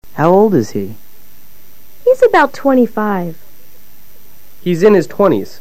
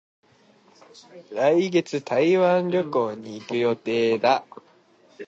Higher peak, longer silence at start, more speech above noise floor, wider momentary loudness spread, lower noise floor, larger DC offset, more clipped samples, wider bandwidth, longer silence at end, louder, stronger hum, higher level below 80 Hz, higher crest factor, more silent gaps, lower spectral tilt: first, 0 dBFS vs -6 dBFS; second, 0 s vs 1.15 s; about the same, 33 dB vs 35 dB; first, 13 LU vs 9 LU; second, -45 dBFS vs -57 dBFS; first, 5% vs under 0.1%; neither; first, 16 kHz vs 7.8 kHz; about the same, 0.15 s vs 0.05 s; first, -12 LUFS vs -22 LUFS; neither; first, -50 dBFS vs -74 dBFS; about the same, 14 dB vs 18 dB; neither; about the same, -7 dB/octave vs -6 dB/octave